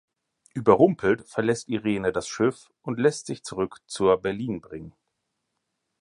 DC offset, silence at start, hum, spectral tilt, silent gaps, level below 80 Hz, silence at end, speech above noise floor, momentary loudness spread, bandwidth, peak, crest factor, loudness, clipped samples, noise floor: under 0.1%; 0.55 s; none; -5.5 dB/octave; none; -58 dBFS; 1.1 s; 55 dB; 15 LU; 11 kHz; -4 dBFS; 22 dB; -25 LUFS; under 0.1%; -79 dBFS